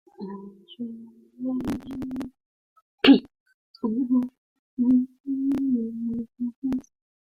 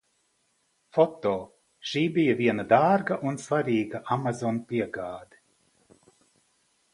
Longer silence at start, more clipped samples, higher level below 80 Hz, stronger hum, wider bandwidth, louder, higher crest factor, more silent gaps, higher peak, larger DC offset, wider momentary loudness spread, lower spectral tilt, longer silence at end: second, 0.2 s vs 0.95 s; neither; first, -60 dBFS vs -66 dBFS; neither; second, 6.4 kHz vs 11.5 kHz; about the same, -25 LUFS vs -26 LUFS; about the same, 22 dB vs 22 dB; first, 2.46-2.76 s, 2.82-2.98 s, 3.40-3.46 s, 3.54-3.74 s, 4.38-4.77 s, 5.20-5.24 s, 6.56-6.62 s vs none; about the same, -4 dBFS vs -6 dBFS; neither; first, 19 LU vs 13 LU; about the same, -6.5 dB/octave vs -6.5 dB/octave; second, 0.55 s vs 1.7 s